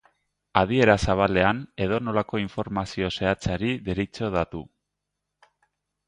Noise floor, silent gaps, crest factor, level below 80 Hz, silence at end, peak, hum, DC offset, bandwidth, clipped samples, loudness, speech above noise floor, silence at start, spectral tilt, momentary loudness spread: -82 dBFS; none; 26 dB; -44 dBFS; 1.45 s; 0 dBFS; 50 Hz at -50 dBFS; under 0.1%; 10.5 kHz; under 0.1%; -24 LUFS; 58 dB; 0.55 s; -6 dB/octave; 10 LU